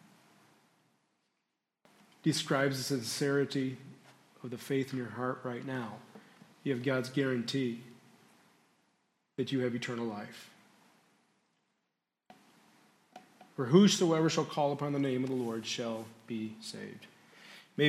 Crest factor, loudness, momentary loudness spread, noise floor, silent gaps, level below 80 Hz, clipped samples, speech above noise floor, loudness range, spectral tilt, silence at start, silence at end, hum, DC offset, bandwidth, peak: 26 dB; -33 LUFS; 19 LU; -85 dBFS; none; -82 dBFS; under 0.1%; 53 dB; 10 LU; -5 dB/octave; 2.25 s; 0 s; none; under 0.1%; 15.5 kHz; -10 dBFS